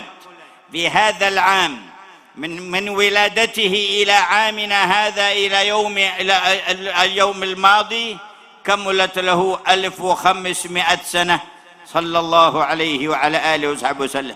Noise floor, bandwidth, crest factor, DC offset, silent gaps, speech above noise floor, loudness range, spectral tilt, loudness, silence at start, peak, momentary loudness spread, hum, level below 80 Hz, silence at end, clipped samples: -43 dBFS; 16 kHz; 18 dB; under 0.1%; none; 26 dB; 3 LU; -2 dB/octave; -16 LUFS; 0 s; 0 dBFS; 9 LU; none; -58 dBFS; 0 s; under 0.1%